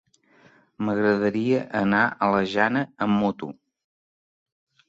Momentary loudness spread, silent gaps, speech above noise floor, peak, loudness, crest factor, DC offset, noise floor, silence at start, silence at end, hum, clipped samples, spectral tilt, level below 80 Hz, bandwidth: 7 LU; none; 35 dB; -4 dBFS; -23 LUFS; 20 dB; under 0.1%; -57 dBFS; 0.8 s; 1.35 s; none; under 0.1%; -7.5 dB/octave; -62 dBFS; 7.6 kHz